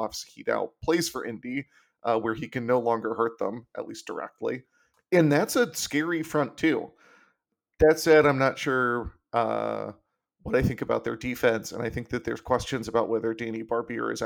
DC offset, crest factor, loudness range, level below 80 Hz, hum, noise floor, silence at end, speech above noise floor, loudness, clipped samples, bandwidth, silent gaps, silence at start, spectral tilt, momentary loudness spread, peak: under 0.1%; 18 dB; 5 LU; -50 dBFS; none; -77 dBFS; 0 s; 50 dB; -27 LUFS; under 0.1%; 18.5 kHz; none; 0 s; -5 dB/octave; 13 LU; -10 dBFS